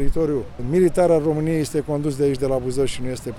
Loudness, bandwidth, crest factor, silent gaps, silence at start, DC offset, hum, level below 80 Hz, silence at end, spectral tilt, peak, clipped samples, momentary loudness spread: -21 LUFS; 15 kHz; 14 dB; none; 0 s; under 0.1%; none; -34 dBFS; 0 s; -7 dB/octave; -6 dBFS; under 0.1%; 7 LU